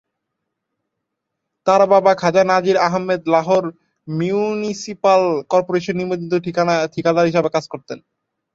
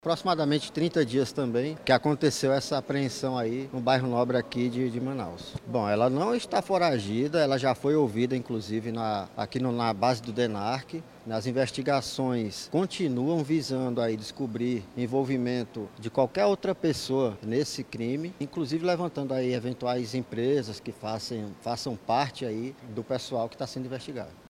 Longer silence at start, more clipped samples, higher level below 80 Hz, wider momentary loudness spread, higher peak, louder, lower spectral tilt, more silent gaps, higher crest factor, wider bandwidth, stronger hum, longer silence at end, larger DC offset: first, 1.65 s vs 0.05 s; neither; about the same, -60 dBFS vs -64 dBFS; about the same, 11 LU vs 9 LU; first, -2 dBFS vs -6 dBFS; first, -17 LUFS vs -29 LUFS; about the same, -6 dB/octave vs -6 dB/octave; neither; second, 16 dB vs 22 dB; second, 7.8 kHz vs 15.5 kHz; neither; first, 0.55 s vs 0.1 s; neither